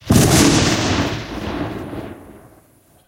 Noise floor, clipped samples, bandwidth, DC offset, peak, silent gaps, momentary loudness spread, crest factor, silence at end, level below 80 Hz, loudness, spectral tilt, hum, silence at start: -52 dBFS; under 0.1%; 17 kHz; under 0.1%; 0 dBFS; none; 19 LU; 18 dB; 0.7 s; -34 dBFS; -16 LUFS; -4.5 dB/octave; none; 0.05 s